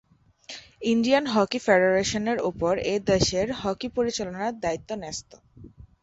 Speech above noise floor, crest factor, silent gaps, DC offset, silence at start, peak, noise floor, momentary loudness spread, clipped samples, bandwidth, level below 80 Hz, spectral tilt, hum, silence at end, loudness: 23 dB; 18 dB; none; under 0.1%; 0.5 s; -6 dBFS; -48 dBFS; 12 LU; under 0.1%; 8 kHz; -50 dBFS; -4.5 dB/octave; none; 0.15 s; -25 LUFS